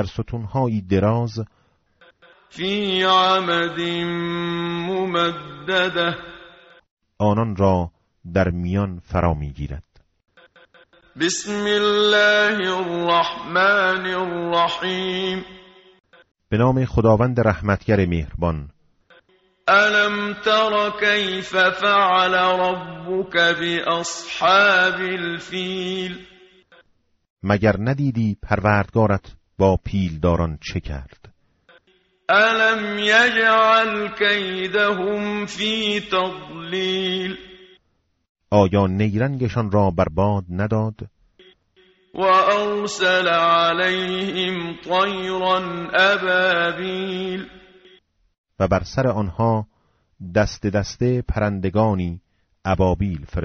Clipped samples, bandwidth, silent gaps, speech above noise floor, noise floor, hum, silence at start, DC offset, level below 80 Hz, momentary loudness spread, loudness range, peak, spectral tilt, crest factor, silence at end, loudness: under 0.1%; 8 kHz; 6.91-6.97 s, 27.30-27.36 s, 38.29-38.35 s, 48.38-48.44 s; 48 dB; -68 dBFS; none; 0 s; under 0.1%; -42 dBFS; 12 LU; 6 LU; -4 dBFS; -3.5 dB/octave; 18 dB; 0 s; -19 LUFS